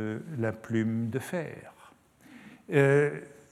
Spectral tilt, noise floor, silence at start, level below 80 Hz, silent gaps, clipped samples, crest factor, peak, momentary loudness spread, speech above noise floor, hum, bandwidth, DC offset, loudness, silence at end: -7.5 dB/octave; -57 dBFS; 0 s; -72 dBFS; none; under 0.1%; 20 dB; -10 dBFS; 19 LU; 29 dB; none; 14 kHz; under 0.1%; -29 LUFS; 0.25 s